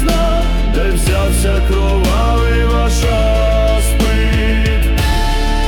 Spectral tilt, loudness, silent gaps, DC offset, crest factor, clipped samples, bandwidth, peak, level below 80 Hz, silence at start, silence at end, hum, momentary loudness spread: -5.5 dB/octave; -14 LUFS; none; under 0.1%; 8 dB; under 0.1%; 18 kHz; -4 dBFS; -14 dBFS; 0 s; 0 s; none; 2 LU